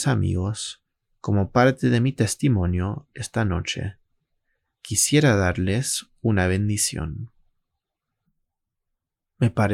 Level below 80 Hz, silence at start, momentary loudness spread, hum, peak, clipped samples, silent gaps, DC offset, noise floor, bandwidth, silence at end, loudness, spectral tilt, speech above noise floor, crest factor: -50 dBFS; 0 s; 13 LU; none; -4 dBFS; under 0.1%; none; under 0.1%; -82 dBFS; 16 kHz; 0 s; -23 LUFS; -5 dB/octave; 60 dB; 20 dB